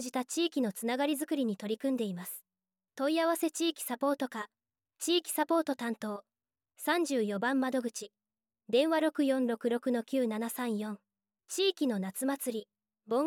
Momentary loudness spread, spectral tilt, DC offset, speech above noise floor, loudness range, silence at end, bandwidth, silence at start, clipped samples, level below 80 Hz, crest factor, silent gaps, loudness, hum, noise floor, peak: 11 LU; -3.5 dB/octave; under 0.1%; over 58 dB; 3 LU; 0 s; 18 kHz; 0 s; under 0.1%; -88 dBFS; 16 dB; none; -32 LUFS; none; under -90 dBFS; -16 dBFS